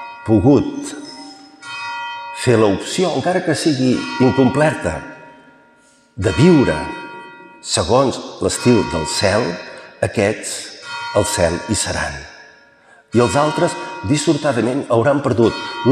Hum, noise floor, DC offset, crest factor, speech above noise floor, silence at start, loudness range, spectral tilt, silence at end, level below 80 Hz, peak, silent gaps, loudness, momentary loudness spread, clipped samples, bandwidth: none; -52 dBFS; under 0.1%; 16 dB; 36 dB; 0 s; 3 LU; -5 dB/octave; 0 s; -46 dBFS; -2 dBFS; none; -17 LUFS; 16 LU; under 0.1%; 14.5 kHz